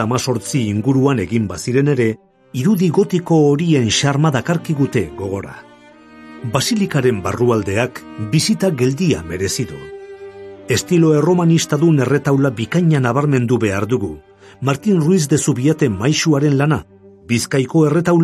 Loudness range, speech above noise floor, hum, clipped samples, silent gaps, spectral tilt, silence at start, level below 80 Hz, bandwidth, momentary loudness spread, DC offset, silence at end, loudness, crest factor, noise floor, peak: 4 LU; 28 dB; none; under 0.1%; none; -6 dB/octave; 0 s; -44 dBFS; 14 kHz; 11 LU; under 0.1%; 0 s; -16 LUFS; 16 dB; -43 dBFS; 0 dBFS